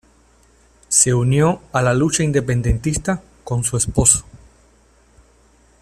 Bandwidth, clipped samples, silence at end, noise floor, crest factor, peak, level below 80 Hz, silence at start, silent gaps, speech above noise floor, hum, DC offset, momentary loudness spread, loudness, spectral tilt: 14.5 kHz; under 0.1%; 1.45 s; -53 dBFS; 20 dB; 0 dBFS; -36 dBFS; 0.9 s; none; 36 dB; none; under 0.1%; 9 LU; -17 LUFS; -4.5 dB/octave